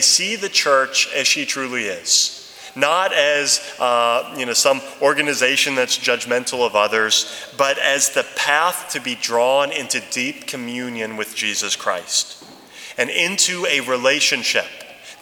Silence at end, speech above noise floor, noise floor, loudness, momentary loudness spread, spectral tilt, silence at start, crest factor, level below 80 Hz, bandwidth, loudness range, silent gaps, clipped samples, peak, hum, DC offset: 0.05 s; 20 dB; -39 dBFS; -18 LUFS; 10 LU; -0.5 dB/octave; 0 s; 20 dB; -70 dBFS; 20 kHz; 4 LU; none; under 0.1%; 0 dBFS; none; under 0.1%